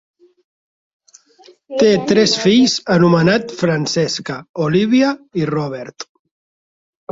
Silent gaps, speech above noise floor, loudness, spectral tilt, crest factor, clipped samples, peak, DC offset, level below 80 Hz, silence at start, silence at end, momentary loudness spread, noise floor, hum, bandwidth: 4.49-4.54 s; 33 dB; -15 LUFS; -5 dB/octave; 16 dB; under 0.1%; 0 dBFS; under 0.1%; -54 dBFS; 1.7 s; 1.1 s; 14 LU; -48 dBFS; none; 7.8 kHz